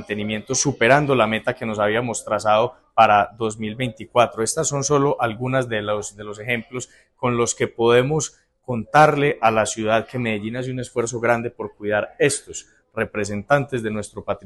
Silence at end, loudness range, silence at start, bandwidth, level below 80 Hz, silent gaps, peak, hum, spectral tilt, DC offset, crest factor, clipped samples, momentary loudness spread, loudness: 0.05 s; 4 LU; 0 s; 12.5 kHz; -52 dBFS; none; 0 dBFS; none; -4.5 dB/octave; under 0.1%; 20 dB; under 0.1%; 13 LU; -21 LUFS